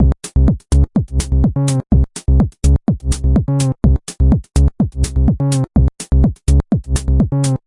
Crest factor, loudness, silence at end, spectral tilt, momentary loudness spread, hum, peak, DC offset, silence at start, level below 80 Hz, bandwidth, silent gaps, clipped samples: 12 dB; -16 LUFS; 0.1 s; -7 dB/octave; 3 LU; none; -2 dBFS; under 0.1%; 0 s; -16 dBFS; 11.5 kHz; none; under 0.1%